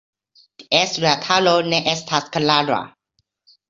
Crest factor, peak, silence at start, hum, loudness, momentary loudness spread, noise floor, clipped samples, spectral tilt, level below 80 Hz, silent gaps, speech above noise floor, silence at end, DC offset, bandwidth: 20 dB; -2 dBFS; 0.6 s; none; -18 LUFS; 7 LU; -71 dBFS; under 0.1%; -3.5 dB/octave; -60 dBFS; none; 52 dB; 0.8 s; under 0.1%; 7.8 kHz